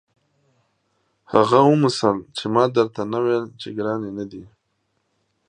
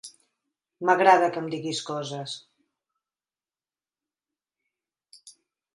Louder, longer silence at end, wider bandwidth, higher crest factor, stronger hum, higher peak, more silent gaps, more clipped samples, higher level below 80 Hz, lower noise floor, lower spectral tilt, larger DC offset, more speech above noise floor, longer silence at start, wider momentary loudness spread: first, -20 LUFS vs -24 LUFS; first, 1.05 s vs 0.45 s; second, 10 kHz vs 11.5 kHz; about the same, 22 dB vs 24 dB; neither; first, 0 dBFS vs -4 dBFS; neither; neither; first, -62 dBFS vs -82 dBFS; second, -71 dBFS vs under -90 dBFS; first, -6.5 dB/octave vs -4 dB/octave; neither; second, 52 dB vs over 66 dB; first, 1.3 s vs 0.05 s; second, 16 LU vs 19 LU